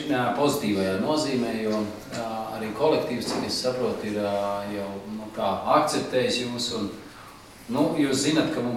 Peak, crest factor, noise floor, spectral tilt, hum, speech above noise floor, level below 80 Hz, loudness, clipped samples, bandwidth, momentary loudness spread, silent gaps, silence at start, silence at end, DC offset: -6 dBFS; 20 dB; -45 dBFS; -4.5 dB/octave; none; 20 dB; -58 dBFS; -26 LUFS; under 0.1%; 16 kHz; 11 LU; none; 0 s; 0 s; under 0.1%